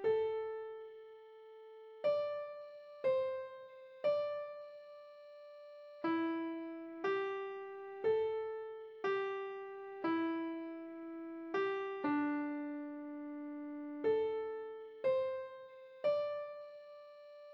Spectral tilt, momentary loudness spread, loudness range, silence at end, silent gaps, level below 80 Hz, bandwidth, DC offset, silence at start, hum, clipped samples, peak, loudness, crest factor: -6.5 dB/octave; 19 LU; 2 LU; 0 s; none; -84 dBFS; 6 kHz; under 0.1%; 0 s; none; under 0.1%; -24 dBFS; -39 LUFS; 14 dB